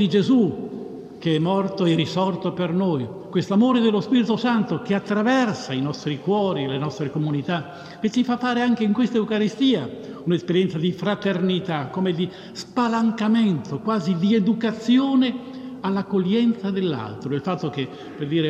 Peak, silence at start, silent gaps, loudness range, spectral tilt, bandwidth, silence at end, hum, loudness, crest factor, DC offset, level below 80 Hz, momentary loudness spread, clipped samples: -6 dBFS; 0 s; none; 3 LU; -7 dB/octave; 8.6 kHz; 0 s; none; -22 LUFS; 14 dB; under 0.1%; -64 dBFS; 9 LU; under 0.1%